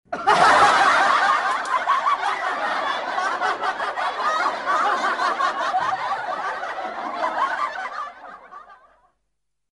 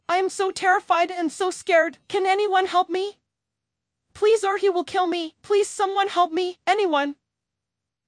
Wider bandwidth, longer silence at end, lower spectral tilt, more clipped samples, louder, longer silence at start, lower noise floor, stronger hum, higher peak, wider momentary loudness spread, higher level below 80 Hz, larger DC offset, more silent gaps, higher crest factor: about the same, 11.5 kHz vs 10.5 kHz; about the same, 1.05 s vs 0.95 s; about the same, -2 dB/octave vs -2 dB/octave; neither; about the same, -21 LUFS vs -22 LUFS; about the same, 0.1 s vs 0.1 s; second, -79 dBFS vs -85 dBFS; neither; about the same, -4 dBFS vs -6 dBFS; first, 14 LU vs 5 LU; first, -62 dBFS vs -72 dBFS; neither; neither; about the same, 18 dB vs 18 dB